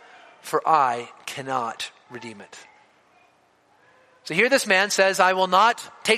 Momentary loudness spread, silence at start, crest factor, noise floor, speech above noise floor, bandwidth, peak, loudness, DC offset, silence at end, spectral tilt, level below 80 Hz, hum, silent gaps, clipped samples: 21 LU; 0.45 s; 22 dB; -61 dBFS; 39 dB; 15 kHz; -2 dBFS; -21 LUFS; under 0.1%; 0 s; -2.5 dB/octave; -76 dBFS; none; none; under 0.1%